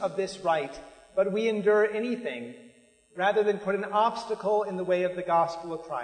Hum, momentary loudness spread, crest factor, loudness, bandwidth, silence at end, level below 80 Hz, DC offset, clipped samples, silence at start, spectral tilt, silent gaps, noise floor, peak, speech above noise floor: none; 12 LU; 16 dB; -27 LUFS; 9.6 kHz; 0 s; -66 dBFS; under 0.1%; under 0.1%; 0 s; -5.5 dB/octave; none; -58 dBFS; -12 dBFS; 31 dB